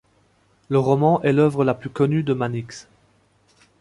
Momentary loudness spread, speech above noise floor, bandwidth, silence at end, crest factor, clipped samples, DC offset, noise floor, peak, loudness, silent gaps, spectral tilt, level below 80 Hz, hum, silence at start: 12 LU; 41 dB; 11.5 kHz; 1 s; 18 dB; under 0.1%; under 0.1%; -61 dBFS; -4 dBFS; -20 LUFS; none; -8 dB/octave; -58 dBFS; none; 0.7 s